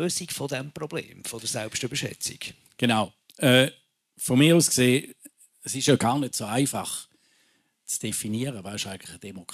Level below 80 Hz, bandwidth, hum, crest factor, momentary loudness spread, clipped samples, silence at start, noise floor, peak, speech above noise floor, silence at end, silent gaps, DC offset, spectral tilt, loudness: -64 dBFS; 15 kHz; none; 22 dB; 17 LU; under 0.1%; 0 s; -67 dBFS; -4 dBFS; 42 dB; 0 s; none; under 0.1%; -4 dB/octave; -25 LUFS